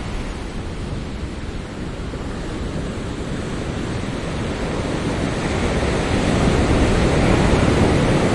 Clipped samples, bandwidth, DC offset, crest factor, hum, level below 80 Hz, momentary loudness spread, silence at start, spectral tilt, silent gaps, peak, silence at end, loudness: under 0.1%; 11.5 kHz; under 0.1%; 18 dB; none; -28 dBFS; 13 LU; 0 s; -6 dB/octave; none; -2 dBFS; 0 s; -21 LUFS